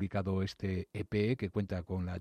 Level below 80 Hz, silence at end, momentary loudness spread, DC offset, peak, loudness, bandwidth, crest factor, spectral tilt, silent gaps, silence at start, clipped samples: -60 dBFS; 0 s; 5 LU; under 0.1%; -18 dBFS; -36 LUFS; 9.2 kHz; 16 dB; -8 dB/octave; none; 0 s; under 0.1%